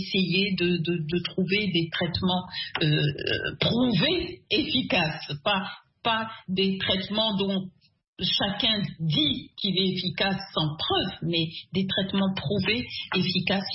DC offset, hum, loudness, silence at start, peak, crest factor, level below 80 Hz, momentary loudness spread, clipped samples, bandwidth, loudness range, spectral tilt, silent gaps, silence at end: under 0.1%; none; -26 LUFS; 0 s; -10 dBFS; 18 dB; -54 dBFS; 5 LU; under 0.1%; 5.8 kHz; 1 LU; -9 dB/octave; 8.08-8.13 s; 0 s